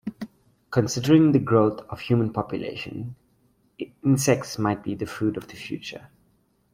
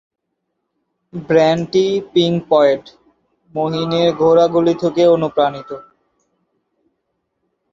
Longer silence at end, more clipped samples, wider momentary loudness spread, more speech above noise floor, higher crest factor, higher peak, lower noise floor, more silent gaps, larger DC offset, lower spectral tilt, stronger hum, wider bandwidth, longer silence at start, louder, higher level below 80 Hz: second, 0.7 s vs 1.9 s; neither; first, 20 LU vs 17 LU; second, 42 dB vs 59 dB; about the same, 20 dB vs 16 dB; second, -6 dBFS vs -2 dBFS; second, -65 dBFS vs -73 dBFS; neither; neither; about the same, -6 dB/octave vs -6.5 dB/octave; neither; first, 16 kHz vs 7.4 kHz; second, 0.05 s vs 1.15 s; second, -24 LUFS vs -15 LUFS; about the same, -58 dBFS vs -58 dBFS